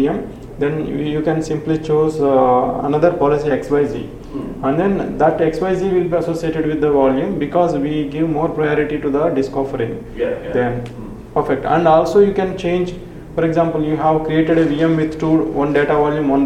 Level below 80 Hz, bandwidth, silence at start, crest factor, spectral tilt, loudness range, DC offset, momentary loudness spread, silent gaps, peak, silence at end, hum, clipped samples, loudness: -38 dBFS; 11.5 kHz; 0 s; 16 dB; -7.5 dB/octave; 3 LU; under 0.1%; 8 LU; none; 0 dBFS; 0 s; none; under 0.1%; -17 LUFS